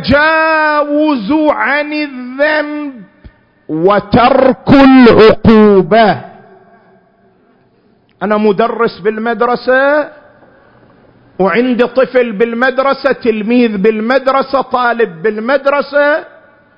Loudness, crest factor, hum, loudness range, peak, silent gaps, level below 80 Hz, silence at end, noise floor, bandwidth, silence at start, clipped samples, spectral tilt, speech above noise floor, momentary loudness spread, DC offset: -10 LUFS; 10 dB; none; 7 LU; 0 dBFS; none; -38 dBFS; 0.5 s; -51 dBFS; 6 kHz; 0 s; 0.5%; -8 dB/octave; 41 dB; 10 LU; under 0.1%